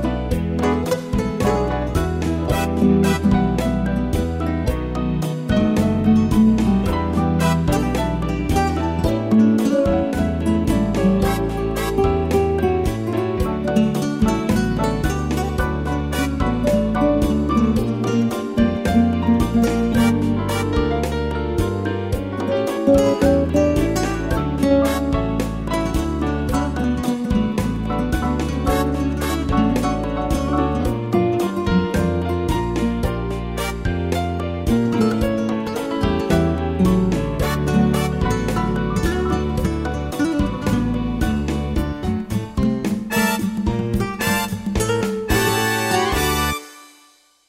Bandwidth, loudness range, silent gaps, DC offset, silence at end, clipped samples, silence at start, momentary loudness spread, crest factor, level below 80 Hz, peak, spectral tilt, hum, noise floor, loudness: 16 kHz; 3 LU; none; under 0.1%; 0.65 s; under 0.1%; 0 s; 6 LU; 16 dB; -28 dBFS; -4 dBFS; -6.5 dB/octave; none; -54 dBFS; -20 LUFS